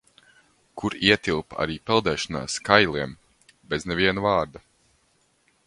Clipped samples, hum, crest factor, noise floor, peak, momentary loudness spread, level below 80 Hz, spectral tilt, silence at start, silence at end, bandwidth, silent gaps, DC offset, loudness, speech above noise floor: under 0.1%; none; 26 dB; -66 dBFS; 0 dBFS; 13 LU; -50 dBFS; -4 dB/octave; 0.75 s; 1.1 s; 11.5 kHz; none; under 0.1%; -23 LUFS; 42 dB